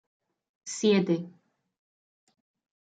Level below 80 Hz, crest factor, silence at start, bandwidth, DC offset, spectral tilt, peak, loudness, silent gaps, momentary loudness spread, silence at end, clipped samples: -78 dBFS; 18 dB; 0.65 s; 9.4 kHz; under 0.1%; -5 dB/octave; -14 dBFS; -26 LUFS; none; 21 LU; 1.55 s; under 0.1%